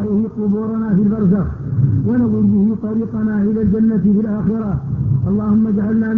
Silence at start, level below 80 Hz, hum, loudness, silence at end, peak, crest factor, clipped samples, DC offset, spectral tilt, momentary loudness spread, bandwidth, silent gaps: 0 s; -36 dBFS; none; -16 LUFS; 0 s; -4 dBFS; 12 dB; under 0.1%; under 0.1%; -12.5 dB/octave; 5 LU; 2.1 kHz; none